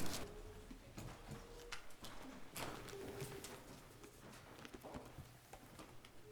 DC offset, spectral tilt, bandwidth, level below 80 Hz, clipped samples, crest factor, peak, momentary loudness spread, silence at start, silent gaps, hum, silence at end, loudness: under 0.1%; -4 dB/octave; over 20 kHz; -62 dBFS; under 0.1%; 22 dB; -28 dBFS; 10 LU; 0 s; none; none; 0 s; -54 LUFS